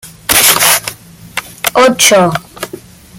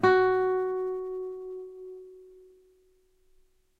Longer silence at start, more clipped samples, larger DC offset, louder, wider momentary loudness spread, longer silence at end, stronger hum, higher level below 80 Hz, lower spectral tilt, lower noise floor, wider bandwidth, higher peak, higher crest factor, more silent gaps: about the same, 0.05 s vs 0 s; first, 0.4% vs under 0.1%; neither; first, -8 LUFS vs -28 LUFS; second, 19 LU vs 22 LU; second, 0.4 s vs 1.5 s; neither; first, -44 dBFS vs -64 dBFS; second, -1.5 dB/octave vs -7 dB/octave; second, -32 dBFS vs -65 dBFS; first, over 20 kHz vs 6.4 kHz; first, 0 dBFS vs -10 dBFS; second, 12 dB vs 20 dB; neither